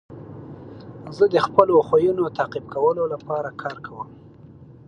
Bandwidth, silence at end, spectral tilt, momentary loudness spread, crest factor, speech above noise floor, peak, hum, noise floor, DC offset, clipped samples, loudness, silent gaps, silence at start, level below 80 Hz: 9.4 kHz; 0.25 s; -7.5 dB/octave; 23 LU; 22 dB; 24 dB; 0 dBFS; none; -45 dBFS; under 0.1%; under 0.1%; -21 LUFS; none; 0.1 s; -58 dBFS